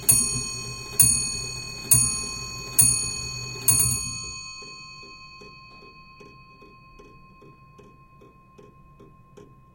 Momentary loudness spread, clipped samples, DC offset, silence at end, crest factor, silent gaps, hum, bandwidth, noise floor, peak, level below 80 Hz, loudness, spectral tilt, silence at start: 24 LU; under 0.1%; under 0.1%; 0.3 s; 24 dB; none; none; 16.5 kHz; -52 dBFS; -2 dBFS; -48 dBFS; -21 LUFS; -1 dB/octave; 0 s